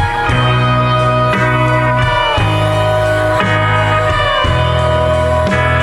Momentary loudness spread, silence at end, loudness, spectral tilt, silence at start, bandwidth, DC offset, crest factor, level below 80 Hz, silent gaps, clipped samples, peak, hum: 1 LU; 0 s; -12 LUFS; -6 dB/octave; 0 s; 12 kHz; under 0.1%; 10 dB; -26 dBFS; none; under 0.1%; -2 dBFS; none